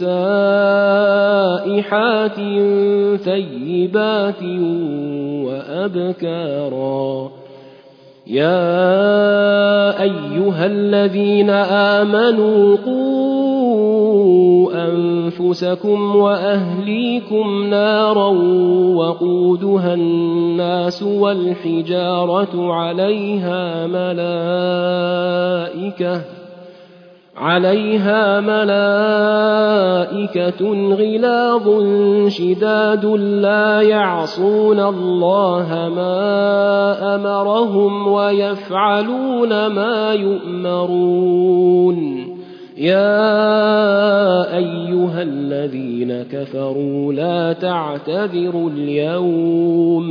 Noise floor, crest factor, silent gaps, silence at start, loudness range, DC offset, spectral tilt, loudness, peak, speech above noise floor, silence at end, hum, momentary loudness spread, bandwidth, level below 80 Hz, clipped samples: -44 dBFS; 14 dB; none; 0 s; 6 LU; under 0.1%; -8 dB/octave; -16 LUFS; -2 dBFS; 29 dB; 0 s; none; 8 LU; 5.4 kHz; -70 dBFS; under 0.1%